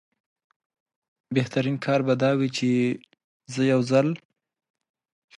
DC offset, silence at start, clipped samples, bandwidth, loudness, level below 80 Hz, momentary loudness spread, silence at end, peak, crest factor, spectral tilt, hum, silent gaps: under 0.1%; 1.3 s; under 0.1%; 11.5 kHz; -24 LUFS; -70 dBFS; 8 LU; 1.25 s; -8 dBFS; 18 dB; -6.5 dB/octave; none; 3.24-3.40 s